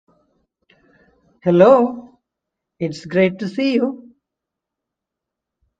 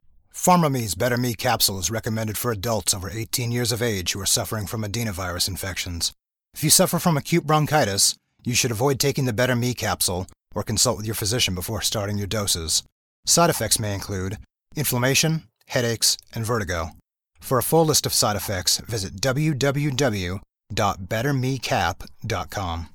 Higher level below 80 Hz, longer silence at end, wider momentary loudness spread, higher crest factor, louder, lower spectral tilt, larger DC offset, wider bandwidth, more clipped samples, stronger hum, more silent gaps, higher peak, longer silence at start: second, -62 dBFS vs -46 dBFS; first, 1.85 s vs 0.05 s; first, 16 LU vs 11 LU; about the same, 20 dB vs 20 dB; first, -17 LUFS vs -22 LUFS; first, -7.5 dB/octave vs -3.5 dB/octave; neither; second, 7.8 kHz vs 19 kHz; neither; neither; second, none vs 12.92-13.23 s; about the same, 0 dBFS vs -2 dBFS; first, 1.45 s vs 0.35 s